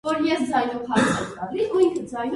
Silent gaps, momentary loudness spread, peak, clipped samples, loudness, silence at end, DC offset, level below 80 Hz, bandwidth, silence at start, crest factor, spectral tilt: none; 7 LU; -6 dBFS; under 0.1%; -23 LUFS; 0 s; under 0.1%; -54 dBFS; 11.5 kHz; 0.05 s; 18 dB; -5 dB/octave